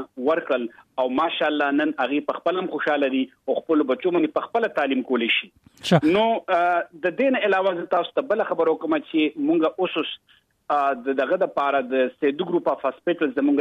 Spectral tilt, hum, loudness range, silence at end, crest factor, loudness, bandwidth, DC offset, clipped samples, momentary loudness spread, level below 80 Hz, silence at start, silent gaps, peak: -6.5 dB/octave; none; 2 LU; 0 s; 18 dB; -23 LUFS; 10 kHz; under 0.1%; under 0.1%; 5 LU; -68 dBFS; 0 s; none; -4 dBFS